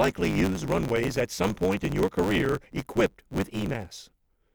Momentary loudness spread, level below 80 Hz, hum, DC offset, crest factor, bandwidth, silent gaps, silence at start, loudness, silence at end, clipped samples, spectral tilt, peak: 8 LU; -44 dBFS; none; under 0.1%; 18 dB; over 20 kHz; none; 0 s; -27 LUFS; 0.5 s; under 0.1%; -6 dB/octave; -10 dBFS